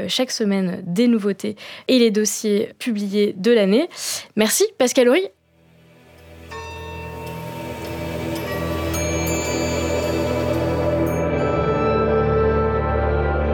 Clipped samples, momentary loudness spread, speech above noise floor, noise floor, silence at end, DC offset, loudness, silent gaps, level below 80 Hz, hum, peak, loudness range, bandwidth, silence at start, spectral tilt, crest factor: under 0.1%; 14 LU; 35 dB; -54 dBFS; 0 s; under 0.1%; -20 LUFS; none; -34 dBFS; none; -2 dBFS; 9 LU; over 20 kHz; 0 s; -5 dB/octave; 18 dB